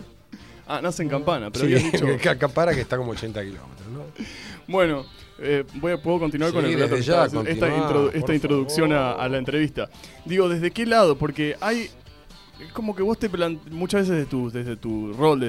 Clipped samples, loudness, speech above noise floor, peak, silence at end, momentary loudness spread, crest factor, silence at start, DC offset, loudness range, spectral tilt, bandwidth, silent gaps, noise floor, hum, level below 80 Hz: under 0.1%; -23 LUFS; 24 dB; -4 dBFS; 0 s; 16 LU; 18 dB; 0 s; 0.1%; 5 LU; -6 dB/octave; 15.5 kHz; none; -47 dBFS; none; -48 dBFS